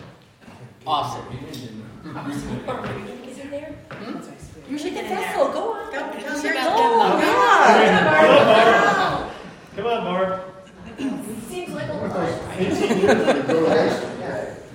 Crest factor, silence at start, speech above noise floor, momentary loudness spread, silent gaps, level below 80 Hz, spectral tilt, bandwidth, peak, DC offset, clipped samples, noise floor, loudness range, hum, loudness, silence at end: 20 dB; 0 s; 26 dB; 22 LU; none; -52 dBFS; -5 dB/octave; 16.5 kHz; 0 dBFS; under 0.1%; under 0.1%; -46 dBFS; 15 LU; none; -19 LUFS; 0 s